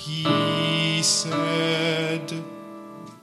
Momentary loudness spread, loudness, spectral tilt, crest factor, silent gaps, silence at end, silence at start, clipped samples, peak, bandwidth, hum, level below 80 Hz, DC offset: 20 LU; -22 LUFS; -3.5 dB/octave; 18 dB; none; 0.05 s; 0 s; under 0.1%; -8 dBFS; 13.5 kHz; none; -70 dBFS; under 0.1%